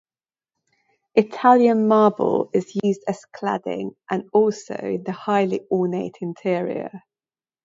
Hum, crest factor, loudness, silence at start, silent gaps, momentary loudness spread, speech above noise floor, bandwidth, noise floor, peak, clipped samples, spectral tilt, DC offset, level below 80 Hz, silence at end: none; 20 dB; -21 LUFS; 1.15 s; none; 13 LU; over 69 dB; 7.8 kHz; under -90 dBFS; -2 dBFS; under 0.1%; -7 dB/octave; under 0.1%; -70 dBFS; 0.65 s